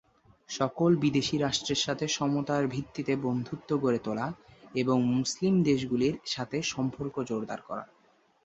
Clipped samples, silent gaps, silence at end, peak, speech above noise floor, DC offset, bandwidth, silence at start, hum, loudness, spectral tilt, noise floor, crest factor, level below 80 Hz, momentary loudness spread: under 0.1%; none; 0.6 s; -12 dBFS; 37 dB; under 0.1%; 8.2 kHz; 0.5 s; none; -29 LUFS; -5 dB/octave; -65 dBFS; 18 dB; -62 dBFS; 10 LU